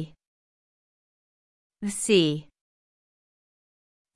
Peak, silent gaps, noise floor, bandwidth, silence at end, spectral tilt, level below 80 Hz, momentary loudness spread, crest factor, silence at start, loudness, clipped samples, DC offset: -8 dBFS; 0.27-1.70 s; under -90 dBFS; 12 kHz; 1.75 s; -4 dB/octave; -68 dBFS; 15 LU; 24 dB; 0 s; -25 LUFS; under 0.1%; under 0.1%